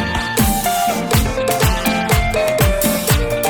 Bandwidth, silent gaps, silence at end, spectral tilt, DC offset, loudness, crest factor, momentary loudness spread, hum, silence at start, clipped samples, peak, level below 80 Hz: 19.5 kHz; none; 0 s; -4.5 dB/octave; under 0.1%; -16 LUFS; 14 dB; 2 LU; none; 0 s; under 0.1%; -2 dBFS; -24 dBFS